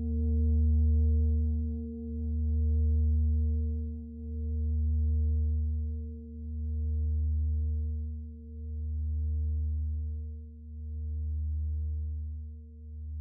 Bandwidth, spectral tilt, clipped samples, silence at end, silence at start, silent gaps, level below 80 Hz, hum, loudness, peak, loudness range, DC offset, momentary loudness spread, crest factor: 0.8 kHz; -16 dB/octave; under 0.1%; 0 s; 0 s; none; -34 dBFS; none; -32 LUFS; -20 dBFS; 7 LU; under 0.1%; 14 LU; 10 dB